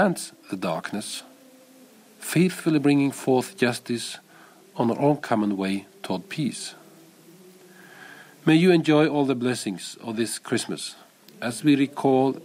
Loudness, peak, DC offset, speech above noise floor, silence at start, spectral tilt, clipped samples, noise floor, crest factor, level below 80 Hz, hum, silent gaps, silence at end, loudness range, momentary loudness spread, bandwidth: -24 LUFS; -6 dBFS; under 0.1%; 29 dB; 0 s; -5.5 dB/octave; under 0.1%; -52 dBFS; 18 dB; -74 dBFS; none; none; 0 s; 4 LU; 15 LU; 16 kHz